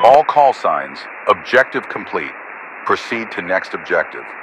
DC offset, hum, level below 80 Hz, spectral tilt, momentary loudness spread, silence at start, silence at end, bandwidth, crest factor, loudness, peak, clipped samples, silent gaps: under 0.1%; none; -60 dBFS; -4.5 dB/octave; 14 LU; 0 s; 0 s; 11.5 kHz; 16 dB; -17 LUFS; 0 dBFS; 0.2%; none